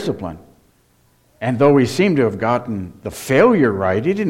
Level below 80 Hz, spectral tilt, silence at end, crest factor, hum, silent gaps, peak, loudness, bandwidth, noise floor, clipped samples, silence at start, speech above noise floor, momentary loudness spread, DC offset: -50 dBFS; -6.5 dB/octave; 0 s; 16 dB; none; none; -2 dBFS; -17 LUFS; 16.5 kHz; -57 dBFS; under 0.1%; 0 s; 41 dB; 14 LU; under 0.1%